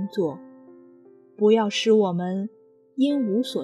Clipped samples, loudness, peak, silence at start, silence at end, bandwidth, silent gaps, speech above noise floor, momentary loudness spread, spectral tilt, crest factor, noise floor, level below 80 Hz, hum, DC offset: under 0.1%; -23 LUFS; -8 dBFS; 0 s; 0 s; 13 kHz; none; 30 dB; 14 LU; -6 dB/octave; 16 dB; -52 dBFS; -80 dBFS; none; under 0.1%